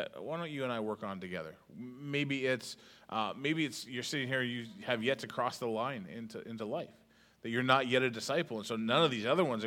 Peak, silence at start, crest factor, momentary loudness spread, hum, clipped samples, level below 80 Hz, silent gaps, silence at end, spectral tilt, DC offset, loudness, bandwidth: -10 dBFS; 0 s; 24 dB; 16 LU; none; under 0.1%; -78 dBFS; none; 0 s; -4.5 dB/octave; under 0.1%; -35 LUFS; 17 kHz